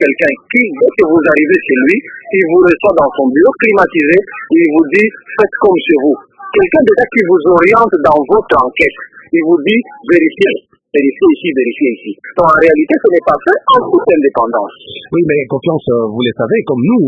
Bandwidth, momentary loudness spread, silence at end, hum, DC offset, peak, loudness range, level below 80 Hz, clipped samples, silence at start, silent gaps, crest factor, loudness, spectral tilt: 7.2 kHz; 7 LU; 0 s; none; under 0.1%; 0 dBFS; 2 LU; -46 dBFS; 0.3%; 0 s; none; 10 dB; -10 LUFS; -7.5 dB/octave